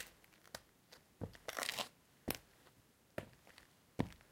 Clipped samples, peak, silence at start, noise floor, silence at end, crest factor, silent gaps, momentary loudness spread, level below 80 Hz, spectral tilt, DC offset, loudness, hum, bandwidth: under 0.1%; -16 dBFS; 0 s; -70 dBFS; 0.1 s; 34 dB; none; 22 LU; -68 dBFS; -3.5 dB/octave; under 0.1%; -47 LUFS; none; 17 kHz